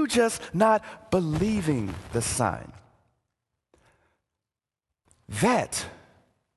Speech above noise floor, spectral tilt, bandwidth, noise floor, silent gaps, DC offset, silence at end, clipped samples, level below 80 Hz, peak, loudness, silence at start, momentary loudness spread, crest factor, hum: 64 dB; -5 dB/octave; 12.5 kHz; -90 dBFS; none; under 0.1%; 0.6 s; under 0.1%; -50 dBFS; -8 dBFS; -26 LUFS; 0 s; 12 LU; 20 dB; none